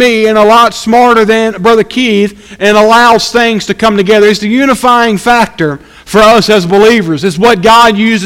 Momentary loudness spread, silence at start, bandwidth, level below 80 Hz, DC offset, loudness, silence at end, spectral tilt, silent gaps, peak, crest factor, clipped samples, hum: 7 LU; 0 s; 16.5 kHz; -36 dBFS; under 0.1%; -6 LUFS; 0 s; -4.5 dB/octave; none; 0 dBFS; 6 dB; 4%; none